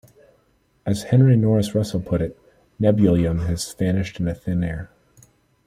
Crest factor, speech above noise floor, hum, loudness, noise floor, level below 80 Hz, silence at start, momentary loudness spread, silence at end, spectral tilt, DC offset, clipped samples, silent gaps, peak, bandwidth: 18 dB; 43 dB; none; -21 LUFS; -62 dBFS; -44 dBFS; 0.85 s; 12 LU; 0.8 s; -7.5 dB/octave; under 0.1%; under 0.1%; none; -4 dBFS; 14.5 kHz